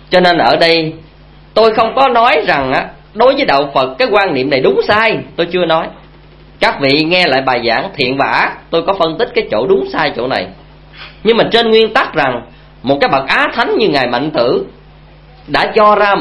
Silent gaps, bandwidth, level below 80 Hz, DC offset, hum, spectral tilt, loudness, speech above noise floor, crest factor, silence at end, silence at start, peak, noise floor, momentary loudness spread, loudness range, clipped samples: none; 11 kHz; -42 dBFS; under 0.1%; none; -6 dB/octave; -12 LUFS; 28 dB; 12 dB; 0 s; 0.1 s; 0 dBFS; -39 dBFS; 8 LU; 3 LU; 0.2%